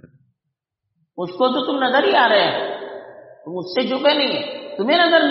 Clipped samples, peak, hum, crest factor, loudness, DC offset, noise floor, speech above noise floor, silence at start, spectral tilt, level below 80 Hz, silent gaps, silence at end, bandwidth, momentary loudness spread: under 0.1%; -2 dBFS; none; 16 dB; -18 LUFS; under 0.1%; -79 dBFS; 62 dB; 0.05 s; -0.5 dB/octave; -72 dBFS; none; 0 s; 5.8 kHz; 18 LU